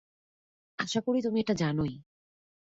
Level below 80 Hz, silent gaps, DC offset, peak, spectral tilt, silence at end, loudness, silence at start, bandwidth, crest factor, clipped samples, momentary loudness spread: -62 dBFS; none; under 0.1%; -14 dBFS; -5.5 dB/octave; 0.75 s; -30 LUFS; 0.8 s; 8 kHz; 18 dB; under 0.1%; 13 LU